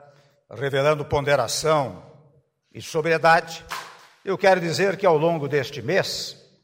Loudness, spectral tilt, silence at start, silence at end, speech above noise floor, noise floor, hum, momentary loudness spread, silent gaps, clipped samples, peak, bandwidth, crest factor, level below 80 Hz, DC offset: -22 LUFS; -4.5 dB/octave; 0.5 s; 0.3 s; 38 dB; -60 dBFS; none; 15 LU; none; under 0.1%; -6 dBFS; 16 kHz; 18 dB; -54 dBFS; under 0.1%